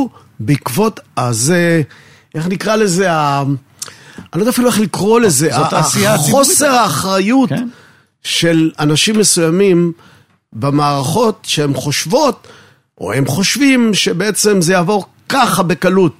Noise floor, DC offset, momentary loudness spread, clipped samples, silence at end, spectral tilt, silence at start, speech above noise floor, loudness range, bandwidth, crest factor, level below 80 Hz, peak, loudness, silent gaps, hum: -32 dBFS; 0.2%; 11 LU; under 0.1%; 0.05 s; -4 dB/octave; 0 s; 19 dB; 4 LU; 16 kHz; 14 dB; -52 dBFS; 0 dBFS; -13 LUFS; none; none